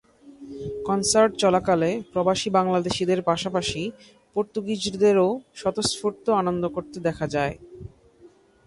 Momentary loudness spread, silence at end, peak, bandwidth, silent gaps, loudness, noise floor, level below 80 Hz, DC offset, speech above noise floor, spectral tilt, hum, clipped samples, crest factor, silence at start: 12 LU; 0.4 s; -6 dBFS; 11.5 kHz; none; -24 LUFS; -54 dBFS; -54 dBFS; under 0.1%; 30 dB; -4.5 dB/octave; none; under 0.1%; 18 dB; 0.25 s